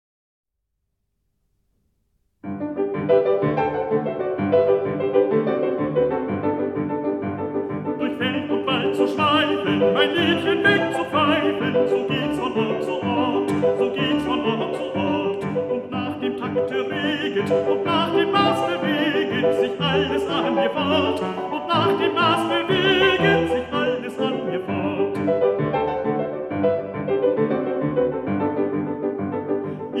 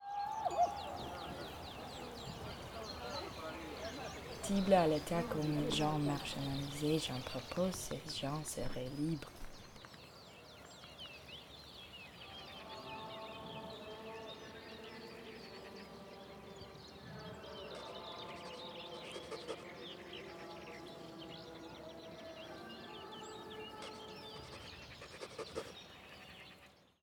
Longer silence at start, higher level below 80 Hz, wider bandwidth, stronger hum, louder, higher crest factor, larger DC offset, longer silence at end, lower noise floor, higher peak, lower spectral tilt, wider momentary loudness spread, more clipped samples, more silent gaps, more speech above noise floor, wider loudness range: first, 2.45 s vs 0 s; about the same, -56 dBFS vs -60 dBFS; second, 12.5 kHz vs over 20 kHz; neither; first, -21 LUFS vs -43 LUFS; second, 18 dB vs 26 dB; neither; second, 0 s vs 0.2 s; first, -77 dBFS vs -63 dBFS; first, -4 dBFS vs -18 dBFS; first, -6.5 dB/octave vs -5 dB/octave; second, 7 LU vs 17 LU; neither; neither; first, 57 dB vs 26 dB; second, 4 LU vs 14 LU